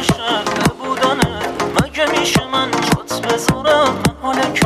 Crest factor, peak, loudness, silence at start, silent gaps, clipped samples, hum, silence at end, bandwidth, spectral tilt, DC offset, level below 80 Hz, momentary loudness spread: 16 dB; 0 dBFS; -16 LUFS; 0 s; none; under 0.1%; none; 0 s; 15.5 kHz; -4 dB/octave; under 0.1%; -38 dBFS; 5 LU